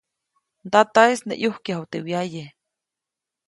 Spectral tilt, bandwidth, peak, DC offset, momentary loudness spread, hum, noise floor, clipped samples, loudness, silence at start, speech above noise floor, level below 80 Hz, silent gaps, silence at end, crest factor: -4.5 dB/octave; 11.5 kHz; -2 dBFS; under 0.1%; 14 LU; none; -87 dBFS; under 0.1%; -21 LUFS; 0.65 s; 66 dB; -70 dBFS; none; 1 s; 22 dB